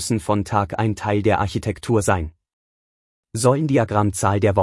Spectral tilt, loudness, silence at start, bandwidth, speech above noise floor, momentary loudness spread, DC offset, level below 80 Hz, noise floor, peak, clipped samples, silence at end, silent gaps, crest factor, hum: -6 dB/octave; -20 LUFS; 0 s; 12 kHz; over 71 dB; 6 LU; under 0.1%; -46 dBFS; under -90 dBFS; -4 dBFS; under 0.1%; 0 s; 2.53-3.23 s; 16 dB; none